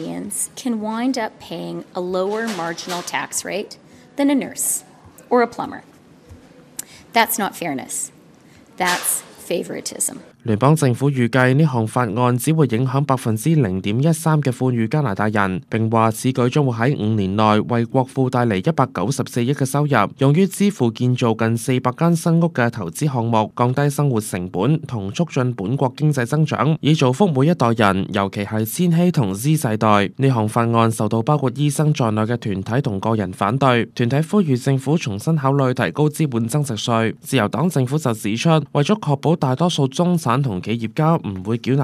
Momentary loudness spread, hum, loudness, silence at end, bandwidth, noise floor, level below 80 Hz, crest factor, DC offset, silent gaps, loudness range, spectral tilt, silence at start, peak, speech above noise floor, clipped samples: 8 LU; none; -19 LUFS; 0 s; 15 kHz; -48 dBFS; -60 dBFS; 18 dB; under 0.1%; none; 5 LU; -6 dB/octave; 0 s; 0 dBFS; 29 dB; under 0.1%